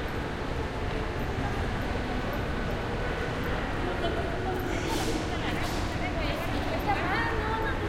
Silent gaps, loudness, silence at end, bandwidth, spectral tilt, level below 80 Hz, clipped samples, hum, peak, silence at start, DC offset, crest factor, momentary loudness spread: none; -31 LUFS; 0 s; 16 kHz; -5.5 dB/octave; -36 dBFS; under 0.1%; none; -16 dBFS; 0 s; under 0.1%; 14 dB; 4 LU